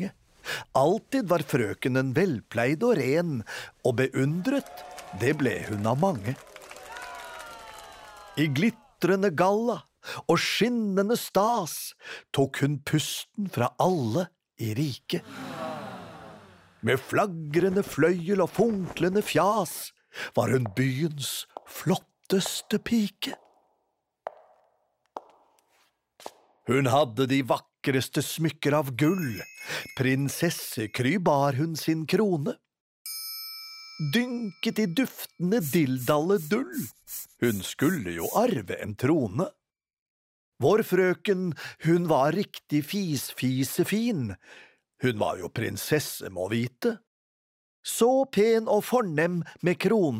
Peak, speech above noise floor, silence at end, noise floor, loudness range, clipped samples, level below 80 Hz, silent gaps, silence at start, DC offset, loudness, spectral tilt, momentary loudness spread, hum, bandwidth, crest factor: -10 dBFS; 51 dB; 0 s; -77 dBFS; 5 LU; under 0.1%; -64 dBFS; 32.80-33.05 s, 39.93-40.52 s, 47.07-47.83 s; 0 s; under 0.1%; -27 LUFS; -5.5 dB/octave; 15 LU; none; 16 kHz; 18 dB